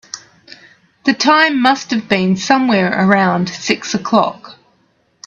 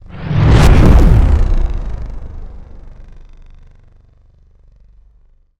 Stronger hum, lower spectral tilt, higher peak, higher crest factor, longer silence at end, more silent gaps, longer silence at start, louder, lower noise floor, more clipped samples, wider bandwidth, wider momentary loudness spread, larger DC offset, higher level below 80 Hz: second, none vs 50 Hz at -45 dBFS; second, -4.5 dB/octave vs -7.5 dB/octave; about the same, 0 dBFS vs 0 dBFS; about the same, 16 dB vs 12 dB; second, 0.75 s vs 2.55 s; neither; about the same, 0.15 s vs 0.15 s; about the same, -14 LUFS vs -12 LUFS; first, -58 dBFS vs -49 dBFS; neither; second, 8 kHz vs 11.5 kHz; second, 9 LU vs 23 LU; neither; second, -58 dBFS vs -16 dBFS